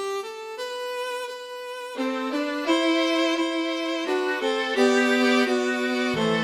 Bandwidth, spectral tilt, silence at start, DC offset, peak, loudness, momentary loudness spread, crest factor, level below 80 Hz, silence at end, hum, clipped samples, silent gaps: 20 kHz; -3.5 dB/octave; 0 s; under 0.1%; -8 dBFS; -24 LUFS; 13 LU; 16 dB; -66 dBFS; 0 s; none; under 0.1%; none